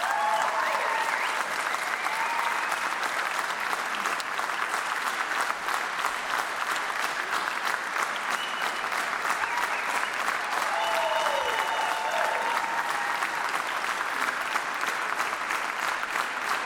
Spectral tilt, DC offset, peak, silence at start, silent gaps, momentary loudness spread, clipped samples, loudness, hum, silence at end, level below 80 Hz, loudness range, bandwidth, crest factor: 0 dB/octave; under 0.1%; -10 dBFS; 0 s; none; 3 LU; under 0.1%; -27 LUFS; none; 0 s; -68 dBFS; 2 LU; 19 kHz; 18 dB